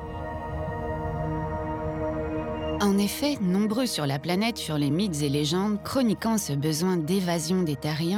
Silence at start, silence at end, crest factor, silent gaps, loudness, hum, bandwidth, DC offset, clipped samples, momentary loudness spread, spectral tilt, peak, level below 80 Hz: 0 s; 0 s; 14 dB; none; -27 LUFS; none; 19.5 kHz; under 0.1%; under 0.1%; 7 LU; -5.5 dB/octave; -12 dBFS; -46 dBFS